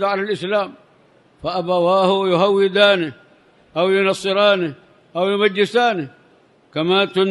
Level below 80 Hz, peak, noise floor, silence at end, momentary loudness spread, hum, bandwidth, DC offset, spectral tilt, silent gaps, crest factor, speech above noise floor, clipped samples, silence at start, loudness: -62 dBFS; 0 dBFS; -53 dBFS; 0 s; 13 LU; none; 11.5 kHz; under 0.1%; -5.5 dB/octave; none; 18 dB; 36 dB; under 0.1%; 0 s; -17 LUFS